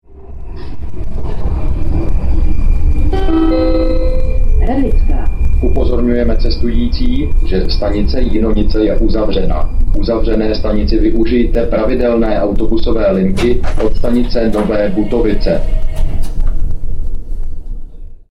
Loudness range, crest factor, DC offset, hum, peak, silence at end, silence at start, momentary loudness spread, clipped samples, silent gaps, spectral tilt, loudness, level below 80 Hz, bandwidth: 3 LU; 8 dB; under 0.1%; none; -2 dBFS; 0.15 s; 0.1 s; 12 LU; under 0.1%; none; -8 dB/octave; -16 LUFS; -14 dBFS; 5.8 kHz